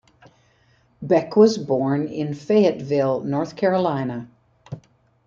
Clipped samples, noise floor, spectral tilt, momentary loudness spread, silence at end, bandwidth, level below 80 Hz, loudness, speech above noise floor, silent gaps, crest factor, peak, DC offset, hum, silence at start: under 0.1%; -60 dBFS; -7 dB/octave; 21 LU; 0.5 s; 7.4 kHz; -62 dBFS; -21 LUFS; 40 dB; none; 20 dB; -2 dBFS; under 0.1%; none; 1 s